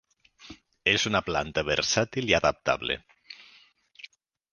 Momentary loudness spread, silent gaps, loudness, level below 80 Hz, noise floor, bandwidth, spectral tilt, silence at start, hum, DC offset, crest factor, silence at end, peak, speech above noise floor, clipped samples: 24 LU; none; -26 LUFS; -52 dBFS; -59 dBFS; 10.5 kHz; -3 dB/octave; 0.45 s; none; under 0.1%; 24 dB; 0.45 s; -4 dBFS; 33 dB; under 0.1%